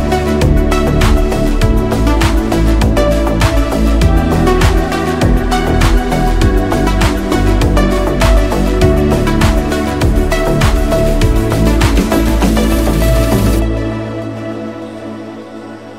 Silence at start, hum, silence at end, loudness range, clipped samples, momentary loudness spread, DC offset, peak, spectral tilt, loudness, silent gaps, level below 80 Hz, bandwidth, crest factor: 0 s; none; 0 s; 1 LU; under 0.1%; 9 LU; 1%; 0 dBFS; -6 dB/octave; -13 LUFS; none; -14 dBFS; 16 kHz; 10 dB